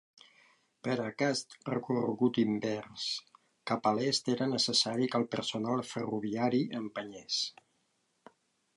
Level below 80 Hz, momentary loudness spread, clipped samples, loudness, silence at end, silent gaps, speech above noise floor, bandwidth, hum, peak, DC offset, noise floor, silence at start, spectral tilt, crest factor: -76 dBFS; 9 LU; under 0.1%; -32 LUFS; 1.25 s; none; 44 dB; 11.5 kHz; none; -14 dBFS; under 0.1%; -76 dBFS; 0.85 s; -4 dB/octave; 18 dB